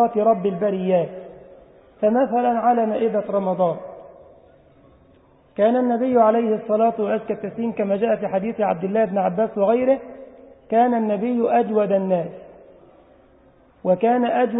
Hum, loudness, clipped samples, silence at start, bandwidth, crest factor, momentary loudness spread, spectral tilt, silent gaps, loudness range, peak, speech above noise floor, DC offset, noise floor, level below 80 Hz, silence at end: none; -20 LUFS; under 0.1%; 0 s; 3.9 kHz; 16 dB; 8 LU; -12 dB/octave; none; 3 LU; -4 dBFS; 34 dB; under 0.1%; -54 dBFS; -62 dBFS; 0 s